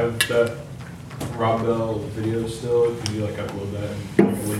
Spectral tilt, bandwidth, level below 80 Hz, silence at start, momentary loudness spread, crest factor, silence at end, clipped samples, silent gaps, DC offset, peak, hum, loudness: -5.5 dB/octave; 17 kHz; -50 dBFS; 0 s; 13 LU; 22 dB; 0 s; under 0.1%; none; under 0.1%; -2 dBFS; none; -23 LUFS